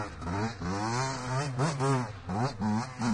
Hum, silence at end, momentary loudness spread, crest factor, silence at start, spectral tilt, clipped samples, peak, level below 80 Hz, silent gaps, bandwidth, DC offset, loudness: none; 0 s; 4 LU; 14 dB; 0 s; -5.5 dB/octave; under 0.1%; -18 dBFS; -52 dBFS; none; 11 kHz; under 0.1%; -32 LUFS